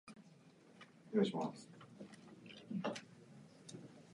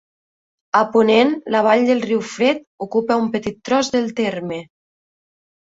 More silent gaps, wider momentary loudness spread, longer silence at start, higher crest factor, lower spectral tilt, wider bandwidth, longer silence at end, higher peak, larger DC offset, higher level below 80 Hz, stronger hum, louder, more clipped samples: second, none vs 2.67-2.78 s; first, 24 LU vs 10 LU; second, 0.05 s vs 0.75 s; first, 24 dB vs 18 dB; about the same, -6 dB/octave vs -5 dB/octave; first, 11 kHz vs 8 kHz; second, 0 s vs 1.15 s; second, -22 dBFS vs -2 dBFS; neither; second, -88 dBFS vs -60 dBFS; neither; second, -42 LUFS vs -18 LUFS; neither